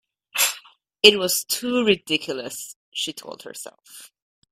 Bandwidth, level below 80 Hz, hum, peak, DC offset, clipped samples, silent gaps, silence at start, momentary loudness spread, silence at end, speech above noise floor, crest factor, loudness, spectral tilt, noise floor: 16 kHz; -64 dBFS; none; 0 dBFS; under 0.1%; under 0.1%; 2.76-2.92 s; 0.35 s; 22 LU; 0.45 s; 24 dB; 24 dB; -20 LUFS; -1.5 dB/octave; -46 dBFS